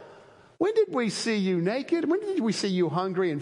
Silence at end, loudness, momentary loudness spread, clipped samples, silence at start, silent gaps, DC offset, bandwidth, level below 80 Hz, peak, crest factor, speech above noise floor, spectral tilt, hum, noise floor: 0 s; -26 LUFS; 2 LU; under 0.1%; 0 s; none; under 0.1%; 11.5 kHz; -76 dBFS; -12 dBFS; 14 dB; 27 dB; -5.5 dB/octave; none; -52 dBFS